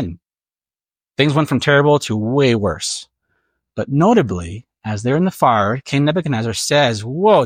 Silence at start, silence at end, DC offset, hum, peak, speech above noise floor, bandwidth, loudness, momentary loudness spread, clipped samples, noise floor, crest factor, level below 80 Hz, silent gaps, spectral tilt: 0 s; 0 s; under 0.1%; none; -2 dBFS; over 74 dB; 16 kHz; -16 LUFS; 14 LU; under 0.1%; under -90 dBFS; 16 dB; -50 dBFS; none; -5.5 dB/octave